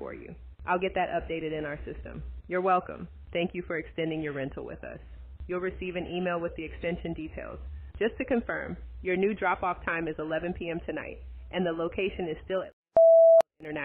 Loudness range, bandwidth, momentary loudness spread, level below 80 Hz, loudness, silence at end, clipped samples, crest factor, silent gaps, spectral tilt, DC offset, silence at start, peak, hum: 8 LU; 4.2 kHz; 17 LU; -48 dBFS; -28 LUFS; 0 s; under 0.1%; 16 dB; 12.73-12.83 s; -4.5 dB/octave; under 0.1%; 0 s; -12 dBFS; none